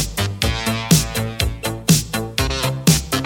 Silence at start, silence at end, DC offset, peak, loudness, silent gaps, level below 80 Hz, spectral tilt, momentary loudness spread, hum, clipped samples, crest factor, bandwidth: 0 s; 0 s; under 0.1%; 0 dBFS; -19 LUFS; none; -30 dBFS; -4 dB/octave; 6 LU; none; under 0.1%; 18 dB; 17.5 kHz